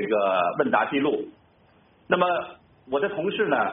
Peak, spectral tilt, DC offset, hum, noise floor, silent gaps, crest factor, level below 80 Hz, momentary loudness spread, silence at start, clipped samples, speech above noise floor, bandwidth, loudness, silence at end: -6 dBFS; -3 dB/octave; under 0.1%; none; -59 dBFS; none; 18 dB; -66 dBFS; 8 LU; 0 s; under 0.1%; 35 dB; 3.9 kHz; -24 LUFS; 0 s